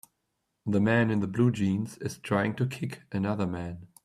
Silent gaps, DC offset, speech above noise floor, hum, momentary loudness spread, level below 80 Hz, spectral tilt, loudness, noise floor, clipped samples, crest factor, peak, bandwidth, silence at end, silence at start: none; under 0.1%; 52 dB; none; 12 LU; -62 dBFS; -7 dB/octave; -29 LUFS; -80 dBFS; under 0.1%; 18 dB; -10 dBFS; 14 kHz; 0.2 s; 0.65 s